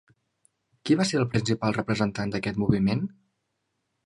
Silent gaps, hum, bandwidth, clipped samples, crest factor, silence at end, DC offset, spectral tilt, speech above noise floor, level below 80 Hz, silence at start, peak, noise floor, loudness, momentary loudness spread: none; none; 11.5 kHz; under 0.1%; 22 dB; 1 s; under 0.1%; -6 dB/octave; 53 dB; -52 dBFS; 0.85 s; -6 dBFS; -78 dBFS; -26 LUFS; 7 LU